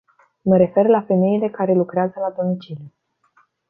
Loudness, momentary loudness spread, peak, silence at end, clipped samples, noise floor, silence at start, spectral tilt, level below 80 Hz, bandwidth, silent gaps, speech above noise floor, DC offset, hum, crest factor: -19 LUFS; 12 LU; -2 dBFS; 0.8 s; under 0.1%; -60 dBFS; 0.45 s; -11.5 dB/octave; -62 dBFS; 4.5 kHz; none; 42 dB; under 0.1%; none; 16 dB